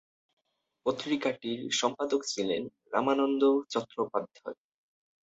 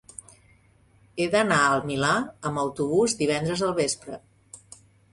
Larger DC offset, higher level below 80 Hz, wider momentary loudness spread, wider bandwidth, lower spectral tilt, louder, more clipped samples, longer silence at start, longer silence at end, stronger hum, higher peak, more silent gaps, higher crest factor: neither; second, -76 dBFS vs -60 dBFS; second, 9 LU vs 22 LU; second, 8.2 kHz vs 11.5 kHz; about the same, -3.5 dB/octave vs -4 dB/octave; second, -30 LUFS vs -24 LUFS; neither; second, 0.85 s vs 1.15 s; first, 0.8 s vs 0.55 s; neither; second, -12 dBFS vs -8 dBFS; neither; about the same, 20 dB vs 18 dB